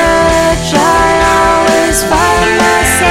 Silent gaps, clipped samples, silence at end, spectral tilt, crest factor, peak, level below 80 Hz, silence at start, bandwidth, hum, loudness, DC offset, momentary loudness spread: none; under 0.1%; 0 s; -3.5 dB/octave; 8 dB; 0 dBFS; -24 dBFS; 0 s; 16.5 kHz; none; -9 LUFS; under 0.1%; 2 LU